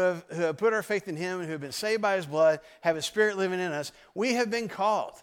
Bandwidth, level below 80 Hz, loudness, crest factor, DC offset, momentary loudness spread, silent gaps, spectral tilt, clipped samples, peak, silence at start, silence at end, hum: 17 kHz; -72 dBFS; -28 LUFS; 16 dB; under 0.1%; 8 LU; none; -4 dB/octave; under 0.1%; -12 dBFS; 0 s; 0 s; none